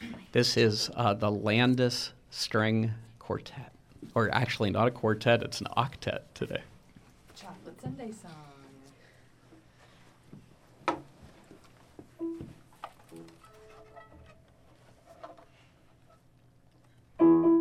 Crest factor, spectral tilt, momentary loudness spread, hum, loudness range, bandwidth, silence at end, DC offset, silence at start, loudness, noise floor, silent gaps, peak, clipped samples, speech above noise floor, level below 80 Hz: 22 dB; -5.5 dB/octave; 25 LU; none; 18 LU; 15 kHz; 0 s; under 0.1%; 0 s; -29 LUFS; -61 dBFS; none; -10 dBFS; under 0.1%; 32 dB; -64 dBFS